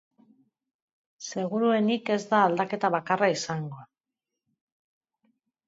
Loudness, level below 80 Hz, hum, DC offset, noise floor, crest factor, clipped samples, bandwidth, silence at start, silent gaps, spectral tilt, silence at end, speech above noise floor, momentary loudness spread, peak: -26 LUFS; -76 dBFS; none; under 0.1%; -88 dBFS; 20 dB; under 0.1%; 8 kHz; 1.2 s; none; -5 dB/octave; 1.85 s; 62 dB; 14 LU; -8 dBFS